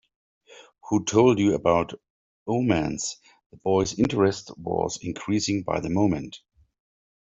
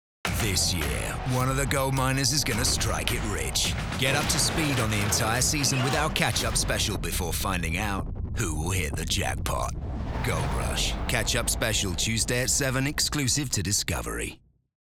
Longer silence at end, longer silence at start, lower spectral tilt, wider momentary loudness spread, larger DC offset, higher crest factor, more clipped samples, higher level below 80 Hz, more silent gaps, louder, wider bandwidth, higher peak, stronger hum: first, 0.9 s vs 0.65 s; first, 0.5 s vs 0.25 s; first, -5.5 dB/octave vs -3 dB/octave; first, 14 LU vs 7 LU; neither; about the same, 20 dB vs 20 dB; neither; second, -54 dBFS vs -36 dBFS; first, 2.10-2.46 s, 3.46-3.50 s vs none; about the same, -24 LUFS vs -26 LUFS; second, 8 kHz vs over 20 kHz; about the same, -6 dBFS vs -8 dBFS; neither